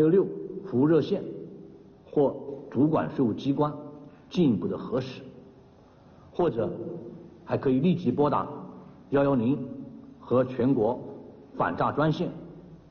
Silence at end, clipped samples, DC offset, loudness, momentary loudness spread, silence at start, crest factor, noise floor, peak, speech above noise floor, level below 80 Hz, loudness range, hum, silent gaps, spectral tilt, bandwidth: 0.15 s; under 0.1%; under 0.1%; -27 LUFS; 20 LU; 0 s; 14 dB; -54 dBFS; -12 dBFS; 29 dB; -60 dBFS; 4 LU; none; none; -7.5 dB/octave; 6.6 kHz